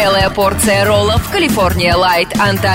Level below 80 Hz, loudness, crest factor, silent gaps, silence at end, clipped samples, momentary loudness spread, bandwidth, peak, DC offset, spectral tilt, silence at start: -28 dBFS; -12 LUFS; 10 dB; none; 0 s; under 0.1%; 3 LU; 16.5 kHz; -2 dBFS; under 0.1%; -4 dB/octave; 0 s